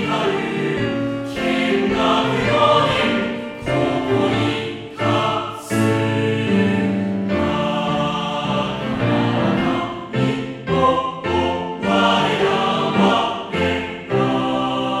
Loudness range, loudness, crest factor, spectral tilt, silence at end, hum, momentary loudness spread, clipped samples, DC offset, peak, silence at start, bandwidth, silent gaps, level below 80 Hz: 2 LU; -19 LUFS; 16 dB; -6 dB/octave; 0 s; none; 7 LU; under 0.1%; under 0.1%; -2 dBFS; 0 s; 14 kHz; none; -46 dBFS